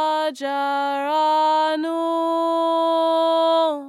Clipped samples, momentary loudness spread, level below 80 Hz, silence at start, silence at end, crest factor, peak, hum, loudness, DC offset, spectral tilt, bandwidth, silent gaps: under 0.1%; 5 LU; under -90 dBFS; 0 s; 0 s; 10 dB; -10 dBFS; none; -20 LUFS; under 0.1%; -2 dB/octave; 12.5 kHz; none